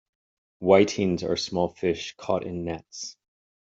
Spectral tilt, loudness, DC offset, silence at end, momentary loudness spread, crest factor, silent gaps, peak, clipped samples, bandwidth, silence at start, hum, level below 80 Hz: -5 dB/octave; -25 LUFS; under 0.1%; 0.5 s; 16 LU; 22 dB; none; -4 dBFS; under 0.1%; 8 kHz; 0.6 s; none; -60 dBFS